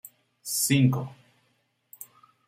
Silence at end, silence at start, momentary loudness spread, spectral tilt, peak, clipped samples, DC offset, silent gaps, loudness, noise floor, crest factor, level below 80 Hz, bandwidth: 0.45 s; 0.45 s; 24 LU; -4.5 dB/octave; -10 dBFS; under 0.1%; under 0.1%; none; -24 LUFS; -71 dBFS; 20 dB; -68 dBFS; 16 kHz